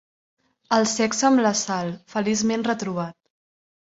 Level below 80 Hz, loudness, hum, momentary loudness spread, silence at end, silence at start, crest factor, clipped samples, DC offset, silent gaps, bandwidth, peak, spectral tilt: -64 dBFS; -22 LUFS; none; 10 LU; 0.85 s; 0.7 s; 18 dB; under 0.1%; under 0.1%; none; 8 kHz; -6 dBFS; -3.5 dB/octave